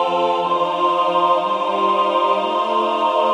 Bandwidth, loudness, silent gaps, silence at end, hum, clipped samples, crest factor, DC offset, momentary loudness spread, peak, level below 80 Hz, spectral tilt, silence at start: 10 kHz; -18 LUFS; none; 0 s; none; under 0.1%; 12 dB; under 0.1%; 2 LU; -4 dBFS; -76 dBFS; -5 dB/octave; 0 s